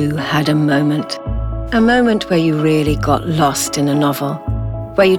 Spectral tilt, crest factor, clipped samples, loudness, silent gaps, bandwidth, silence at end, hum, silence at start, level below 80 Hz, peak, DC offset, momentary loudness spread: -5.5 dB/octave; 14 dB; under 0.1%; -16 LUFS; none; 18 kHz; 0 s; none; 0 s; -30 dBFS; 0 dBFS; under 0.1%; 9 LU